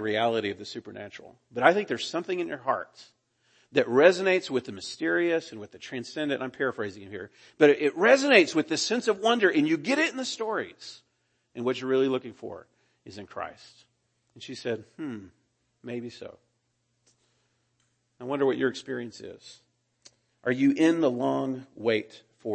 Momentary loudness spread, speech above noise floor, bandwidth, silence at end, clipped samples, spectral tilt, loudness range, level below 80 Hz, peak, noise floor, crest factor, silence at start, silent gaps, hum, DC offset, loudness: 22 LU; 48 dB; 8.8 kHz; 0 s; under 0.1%; -4.5 dB/octave; 16 LU; -76 dBFS; -4 dBFS; -75 dBFS; 24 dB; 0 s; none; none; under 0.1%; -26 LUFS